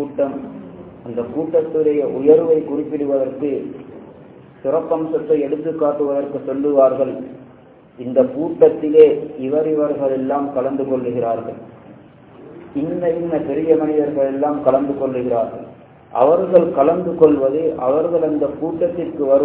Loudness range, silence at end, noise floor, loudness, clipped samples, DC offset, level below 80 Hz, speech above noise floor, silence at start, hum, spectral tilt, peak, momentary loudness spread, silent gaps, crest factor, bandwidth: 5 LU; 0 s; -45 dBFS; -17 LUFS; under 0.1%; under 0.1%; -56 dBFS; 28 dB; 0 s; none; -11.5 dB/octave; 0 dBFS; 13 LU; none; 18 dB; 4 kHz